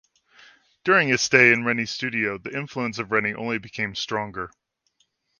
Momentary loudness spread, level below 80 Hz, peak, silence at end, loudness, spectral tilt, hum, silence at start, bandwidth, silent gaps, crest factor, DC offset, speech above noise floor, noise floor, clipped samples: 15 LU; -62 dBFS; 0 dBFS; 0.9 s; -22 LUFS; -3.5 dB/octave; none; 0.85 s; 10.5 kHz; none; 24 dB; under 0.1%; 46 dB; -70 dBFS; under 0.1%